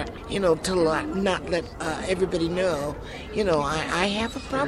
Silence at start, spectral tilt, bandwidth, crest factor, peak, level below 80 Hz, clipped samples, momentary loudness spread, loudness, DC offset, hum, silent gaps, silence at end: 0 s; -5 dB/octave; 14 kHz; 16 dB; -8 dBFS; -42 dBFS; under 0.1%; 7 LU; -25 LUFS; under 0.1%; none; none; 0 s